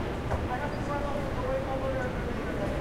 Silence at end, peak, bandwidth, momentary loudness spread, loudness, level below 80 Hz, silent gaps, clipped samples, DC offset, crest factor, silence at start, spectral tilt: 0 s; -18 dBFS; 16 kHz; 2 LU; -32 LUFS; -38 dBFS; none; under 0.1%; under 0.1%; 12 dB; 0 s; -7 dB/octave